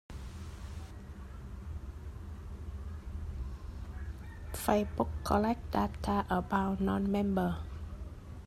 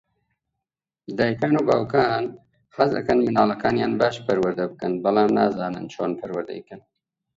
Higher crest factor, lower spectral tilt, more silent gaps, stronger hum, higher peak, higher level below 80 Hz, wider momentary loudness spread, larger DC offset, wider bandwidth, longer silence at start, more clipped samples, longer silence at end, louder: about the same, 22 dB vs 20 dB; about the same, -6.5 dB/octave vs -7 dB/octave; neither; neither; second, -14 dBFS vs -4 dBFS; first, -44 dBFS vs -58 dBFS; first, 15 LU vs 11 LU; neither; first, 14.5 kHz vs 7.8 kHz; second, 0.1 s vs 1.1 s; neither; second, 0 s vs 0.6 s; second, -35 LUFS vs -22 LUFS